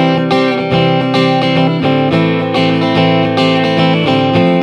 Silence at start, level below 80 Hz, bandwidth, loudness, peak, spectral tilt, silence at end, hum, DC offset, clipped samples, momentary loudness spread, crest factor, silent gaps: 0 s; -48 dBFS; 9.2 kHz; -11 LUFS; 0 dBFS; -7 dB/octave; 0 s; none; under 0.1%; under 0.1%; 2 LU; 10 dB; none